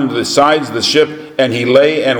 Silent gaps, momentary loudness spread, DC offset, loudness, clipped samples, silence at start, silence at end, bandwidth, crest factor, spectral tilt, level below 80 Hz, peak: none; 6 LU; under 0.1%; -12 LUFS; 0.2%; 0 s; 0 s; 18 kHz; 12 dB; -4 dB/octave; -54 dBFS; 0 dBFS